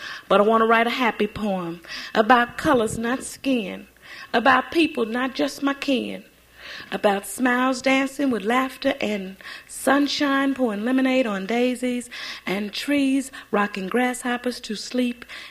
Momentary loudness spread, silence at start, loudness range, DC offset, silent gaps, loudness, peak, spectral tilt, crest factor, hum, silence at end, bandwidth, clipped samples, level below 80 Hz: 14 LU; 0 s; 3 LU; under 0.1%; none; -22 LUFS; -2 dBFS; -4 dB/octave; 20 dB; none; 0 s; 15.5 kHz; under 0.1%; -56 dBFS